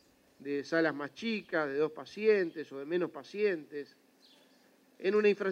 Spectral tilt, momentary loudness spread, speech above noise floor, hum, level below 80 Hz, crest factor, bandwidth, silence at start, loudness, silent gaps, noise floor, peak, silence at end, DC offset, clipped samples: -6 dB/octave; 13 LU; 33 dB; none; -84 dBFS; 18 dB; 8.2 kHz; 0.4 s; -33 LUFS; none; -65 dBFS; -16 dBFS; 0 s; under 0.1%; under 0.1%